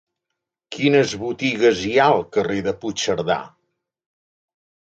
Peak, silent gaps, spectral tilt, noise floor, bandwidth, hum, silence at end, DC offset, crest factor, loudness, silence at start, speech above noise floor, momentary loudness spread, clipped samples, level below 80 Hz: -2 dBFS; none; -4.5 dB/octave; -81 dBFS; 9 kHz; none; 1.4 s; under 0.1%; 18 dB; -20 LUFS; 0.7 s; 62 dB; 8 LU; under 0.1%; -56 dBFS